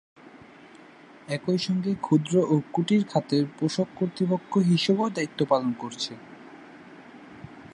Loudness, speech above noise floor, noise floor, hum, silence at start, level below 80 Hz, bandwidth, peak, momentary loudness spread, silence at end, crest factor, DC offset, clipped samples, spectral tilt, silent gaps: -26 LUFS; 25 dB; -50 dBFS; none; 0.25 s; -70 dBFS; 11 kHz; -8 dBFS; 24 LU; 0.05 s; 18 dB; under 0.1%; under 0.1%; -6.5 dB/octave; none